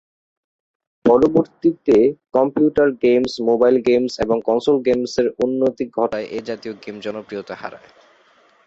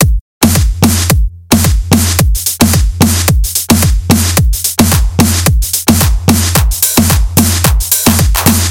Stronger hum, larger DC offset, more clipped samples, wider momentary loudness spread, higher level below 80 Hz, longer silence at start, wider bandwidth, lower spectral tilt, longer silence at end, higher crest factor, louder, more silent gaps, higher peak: neither; neither; second, under 0.1% vs 0.5%; first, 14 LU vs 2 LU; second, -52 dBFS vs -14 dBFS; first, 1.05 s vs 0 s; second, 7.8 kHz vs over 20 kHz; first, -6.5 dB/octave vs -4 dB/octave; first, 0.9 s vs 0 s; first, 16 dB vs 10 dB; second, -18 LUFS vs -9 LUFS; second, none vs 0.21-0.41 s; about the same, -2 dBFS vs 0 dBFS